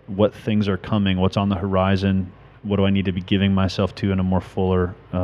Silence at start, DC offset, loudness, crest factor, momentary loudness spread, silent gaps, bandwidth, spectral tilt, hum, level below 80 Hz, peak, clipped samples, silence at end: 0.1 s; under 0.1%; -21 LUFS; 16 dB; 4 LU; none; 7.2 kHz; -8 dB/octave; none; -46 dBFS; -4 dBFS; under 0.1%; 0 s